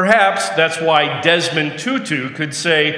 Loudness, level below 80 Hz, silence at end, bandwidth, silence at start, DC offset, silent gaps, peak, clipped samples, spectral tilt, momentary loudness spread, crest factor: -16 LUFS; -64 dBFS; 0 s; 10.5 kHz; 0 s; under 0.1%; none; 0 dBFS; under 0.1%; -3.5 dB/octave; 8 LU; 16 dB